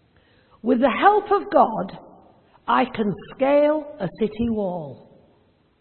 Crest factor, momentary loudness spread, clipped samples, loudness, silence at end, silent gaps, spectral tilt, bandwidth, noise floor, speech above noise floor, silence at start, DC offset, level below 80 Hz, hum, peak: 20 dB; 14 LU; under 0.1%; -21 LUFS; 0.85 s; none; -10.5 dB/octave; 4.4 kHz; -60 dBFS; 40 dB; 0.65 s; under 0.1%; -54 dBFS; none; -2 dBFS